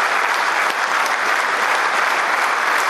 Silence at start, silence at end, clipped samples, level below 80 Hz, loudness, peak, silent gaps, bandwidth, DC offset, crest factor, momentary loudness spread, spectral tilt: 0 s; 0 s; under 0.1%; -82 dBFS; -17 LUFS; -2 dBFS; none; 14.5 kHz; under 0.1%; 16 dB; 1 LU; 0.5 dB/octave